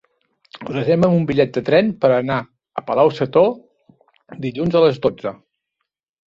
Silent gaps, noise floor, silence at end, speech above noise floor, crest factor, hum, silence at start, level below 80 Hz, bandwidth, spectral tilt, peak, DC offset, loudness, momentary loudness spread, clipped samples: none; -78 dBFS; 0.95 s; 61 dB; 18 dB; none; 0.55 s; -54 dBFS; 7.4 kHz; -8.5 dB/octave; -2 dBFS; under 0.1%; -17 LUFS; 14 LU; under 0.1%